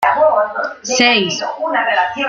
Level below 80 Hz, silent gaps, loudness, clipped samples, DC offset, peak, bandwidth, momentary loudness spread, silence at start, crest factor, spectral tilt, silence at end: -62 dBFS; none; -15 LUFS; under 0.1%; under 0.1%; 0 dBFS; 13.5 kHz; 8 LU; 0 s; 14 dB; -2 dB/octave; 0 s